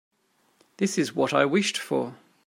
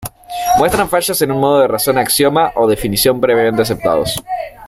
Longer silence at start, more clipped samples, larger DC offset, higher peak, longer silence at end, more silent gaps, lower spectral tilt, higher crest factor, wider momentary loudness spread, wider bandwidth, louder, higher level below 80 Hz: first, 0.8 s vs 0 s; neither; neither; second, -6 dBFS vs 0 dBFS; first, 0.3 s vs 0 s; neither; about the same, -4 dB/octave vs -4 dB/octave; first, 22 dB vs 12 dB; about the same, 8 LU vs 7 LU; about the same, 16 kHz vs 16 kHz; second, -25 LUFS vs -13 LUFS; second, -78 dBFS vs -38 dBFS